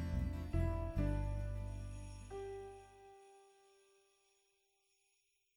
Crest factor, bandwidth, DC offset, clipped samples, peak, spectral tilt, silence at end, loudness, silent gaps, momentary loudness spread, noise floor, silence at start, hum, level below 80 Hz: 18 dB; 12 kHz; under 0.1%; under 0.1%; -26 dBFS; -8 dB/octave; 2.1 s; -43 LUFS; none; 21 LU; -81 dBFS; 0 s; none; -46 dBFS